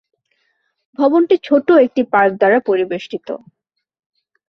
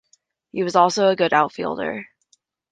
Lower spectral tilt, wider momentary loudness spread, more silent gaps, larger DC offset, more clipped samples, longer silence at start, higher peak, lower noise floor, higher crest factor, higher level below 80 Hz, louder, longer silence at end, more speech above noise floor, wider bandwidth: first, -7 dB/octave vs -4.5 dB/octave; about the same, 15 LU vs 13 LU; neither; neither; neither; first, 1 s vs 0.55 s; about the same, -2 dBFS vs -2 dBFS; about the same, -66 dBFS vs -64 dBFS; about the same, 16 dB vs 20 dB; about the same, -62 dBFS vs -66 dBFS; first, -14 LUFS vs -20 LUFS; first, 1.1 s vs 0.65 s; first, 52 dB vs 45 dB; second, 6.4 kHz vs 9.6 kHz